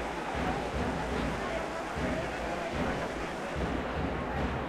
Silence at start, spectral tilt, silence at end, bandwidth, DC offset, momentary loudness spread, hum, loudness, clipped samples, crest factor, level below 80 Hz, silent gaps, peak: 0 s; -5.5 dB/octave; 0 s; 14.5 kHz; under 0.1%; 2 LU; none; -34 LUFS; under 0.1%; 14 dB; -42 dBFS; none; -20 dBFS